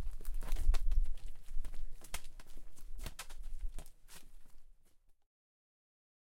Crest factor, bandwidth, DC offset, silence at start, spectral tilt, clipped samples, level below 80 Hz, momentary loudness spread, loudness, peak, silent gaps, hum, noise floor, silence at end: 18 dB; 14 kHz; under 0.1%; 0 s; -3.5 dB/octave; under 0.1%; -38 dBFS; 19 LU; -45 LUFS; -16 dBFS; none; none; -63 dBFS; 1.75 s